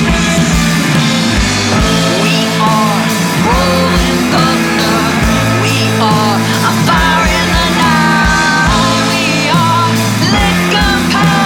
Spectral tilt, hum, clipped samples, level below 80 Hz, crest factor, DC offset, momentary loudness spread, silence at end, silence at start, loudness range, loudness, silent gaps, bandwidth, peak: -4.5 dB/octave; none; under 0.1%; -24 dBFS; 10 dB; under 0.1%; 2 LU; 0 s; 0 s; 1 LU; -10 LUFS; none; 18 kHz; -2 dBFS